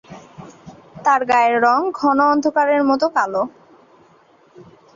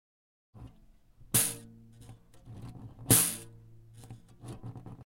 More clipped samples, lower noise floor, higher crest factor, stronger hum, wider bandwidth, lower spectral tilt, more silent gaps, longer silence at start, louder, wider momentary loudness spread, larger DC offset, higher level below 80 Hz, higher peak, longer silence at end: neither; second, -52 dBFS vs -60 dBFS; second, 16 dB vs 28 dB; neither; second, 7.4 kHz vs 16.5 kHz; first, -5 dB/octave vs -2.5 dB/octave; neither; second, 0.1 s vs 0.55 s; first, -17 LUFS vs -27 LUFS; second, 8 LU vs 28 LU; neither; about the same, -62 dBFS vs -58 dBFS; first, -4 dBFS vs -8 dBFS; first, 0.35 s vs 0.05 s